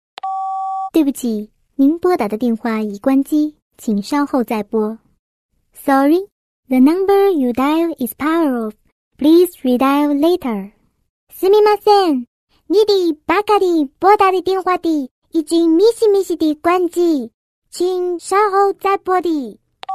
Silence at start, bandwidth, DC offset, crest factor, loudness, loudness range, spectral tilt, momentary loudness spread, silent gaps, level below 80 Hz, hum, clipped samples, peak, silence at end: 0.25 s; 14 kHz; under 0.1%; 16 dB; -16 LUFS; 4 LU; -5 dB/octave; 11 LU; 3.62-3.70 s, 5.19-5.49 s, 6.32-6.63 s, 8.92-9.11 s, 11.09-11.27 s, 12.27-12.47 s, 15.11-15.22 s, 17.34-17.62 s; -56 dBFS; none; under 0.1%; 0 dBFS; 0 s